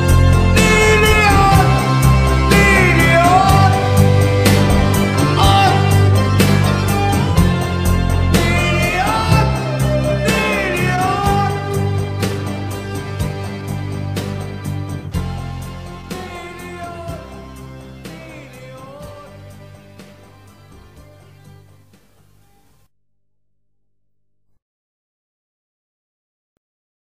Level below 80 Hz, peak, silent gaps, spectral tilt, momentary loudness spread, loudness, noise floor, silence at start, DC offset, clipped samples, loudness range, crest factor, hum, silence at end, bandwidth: -26 dBFS; 0 dBFS; none; -5.5 dB/octave; 21 LU; -14 LUFS; -74 dBFS; 0 s; 0.2%; under 0.1%; 20 LU; 16 dB; 50 Hz at -40 dBFS; 6.1 s; 16 kHz